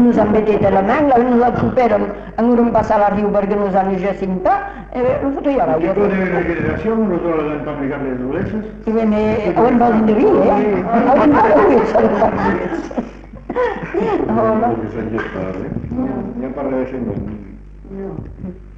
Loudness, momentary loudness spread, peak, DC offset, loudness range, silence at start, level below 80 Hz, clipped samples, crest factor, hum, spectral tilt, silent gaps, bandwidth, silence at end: -16 LUFS; 12 LU; -4 dBFS; under 0.1%; 7 LU; 0 s; -36 dBFS; under 0.1%; 12 dB; none; -9 dB/octave; none; 7.2 kHz; 0 s